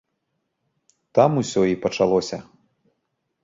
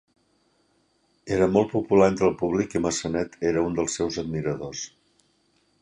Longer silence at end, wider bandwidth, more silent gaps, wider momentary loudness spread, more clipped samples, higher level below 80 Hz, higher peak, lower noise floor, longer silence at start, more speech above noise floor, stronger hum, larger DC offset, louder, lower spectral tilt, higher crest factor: about the same, 1.05 s vs 0.95 s; second, 7.8 kHz vs 10.5 kHz; neither; about the same, 10 LU vs 12 LU; neither; second, -58 dBFS vs -52 dBFS; first, -2 dBFS vs -6 dBFS; first, -76 dBFS vs -67 dBFS; about the same, 1.15 s vs 1.25 s; first, 56 dB vs 43 dB; neither; neither; first, -21 LUFS vs -24 LUFS; about the same, -6 dB/octave vs -5.5 dB/octave; about the same, 22 dB vs 20 dB